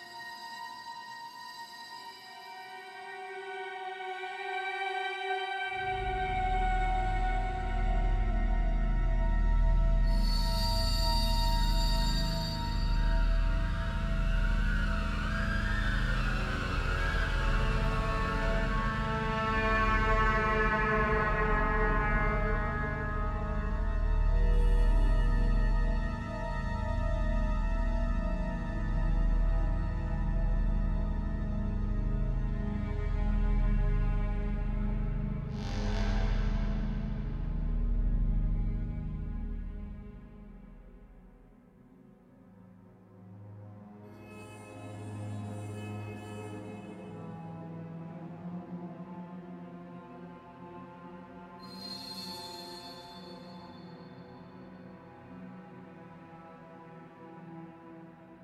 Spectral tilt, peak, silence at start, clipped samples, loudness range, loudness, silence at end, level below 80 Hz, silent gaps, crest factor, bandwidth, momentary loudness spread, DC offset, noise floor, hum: -6 dB/octave; -14 dBFS; 0 s; under 0.1%; 17 LU; -33 LUFS; 0 s; -32 dBFS; none; 16 dB; 13 kHz; 19 LU; under 0.1%; -57 dBFS; none